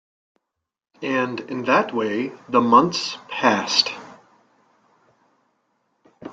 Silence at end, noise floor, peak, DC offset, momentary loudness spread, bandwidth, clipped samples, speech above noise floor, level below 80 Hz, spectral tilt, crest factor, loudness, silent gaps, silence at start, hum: 0 s; -82 dBFS; -2 dBFS; under 0.1%; 12 LU; 9 kHz; under 0.1%; 62 dB; -68 dBFS; -3.5 dB/octave; 22 dB; -20 LUFS; none; 1 s; none